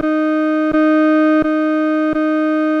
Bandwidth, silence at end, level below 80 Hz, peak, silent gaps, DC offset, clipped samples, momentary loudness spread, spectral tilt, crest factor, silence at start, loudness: 5.6 kHz; 0 s; -48 dBFS; -6 dBFS; none; under 0.1%; under 0.1%; 4 LU; -6.5 dB/octave; 8 dB; 0 s; -15 LUFS